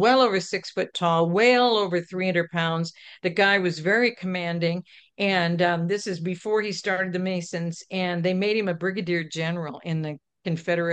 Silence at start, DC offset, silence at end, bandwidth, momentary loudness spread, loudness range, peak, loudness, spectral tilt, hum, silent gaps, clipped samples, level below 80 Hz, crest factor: 0 s; under 0.1%; 0 s; 9 kHz; 10 LU; 4 LU; -6 dBFS; -24 LUFS; -5.5 dB/octave; none; none; under 0.1%; -72 dBFS; 18 dB